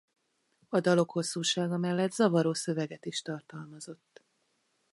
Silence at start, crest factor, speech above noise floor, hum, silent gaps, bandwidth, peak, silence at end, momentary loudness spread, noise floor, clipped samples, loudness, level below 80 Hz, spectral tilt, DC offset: 0.7 s; 20 dB; 45 dB; none; none; 11.5 kHz; -12 dBFS; 1 s; 18 LU; -75 dBFS; under 0.1%; -30 LUFS; -78 dBFS; -5 dB/octave; under 0.1%